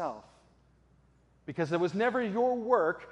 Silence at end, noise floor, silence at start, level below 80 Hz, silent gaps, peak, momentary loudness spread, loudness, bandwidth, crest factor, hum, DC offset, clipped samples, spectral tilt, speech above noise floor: 0 s; -65 dBFS; 0 s; -68 dBFS; none; -12 dBFS; 16 LU; -30 LUFS; 8.6 kHz; 20 dB; none; under 0.1%; under 0.1%; -7 dB/octave; 36 dB